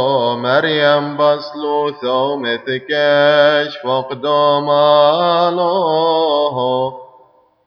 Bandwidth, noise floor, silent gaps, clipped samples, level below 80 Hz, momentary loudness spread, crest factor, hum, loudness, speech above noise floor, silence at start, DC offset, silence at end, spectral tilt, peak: 6.4 kHz; -50 dBFS; none; under 0.1%; -68 dBFS; 8 LU; 14 dB; none; -14 LUFS; 36 dB; 0 s; under 0.1%; 0.6 s; -6.5 dB/octave; 0 dBFS